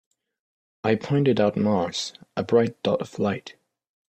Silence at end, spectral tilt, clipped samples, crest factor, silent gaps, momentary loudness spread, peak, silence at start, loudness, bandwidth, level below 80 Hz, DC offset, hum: 0.55 s; -6 dB/octave; under 0.1%; 18 dB; none; 9 LU; -6 dBFS; 0.85 s; -24 LUFS; 9 kHz; -62 dBFS; under 0.1%; none